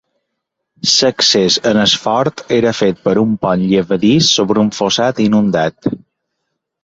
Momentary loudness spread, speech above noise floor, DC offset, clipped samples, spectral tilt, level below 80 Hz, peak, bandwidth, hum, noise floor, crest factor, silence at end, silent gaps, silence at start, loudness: 6 LU; 62 dB; under 0.1%; under 0.1%; -4 dB/octave; -50 dBFS; 0 dBFS; 8 kHz; none; -75 dBFS; 14 dB; 0.85 s; none; 0.85 s; -13 LUFS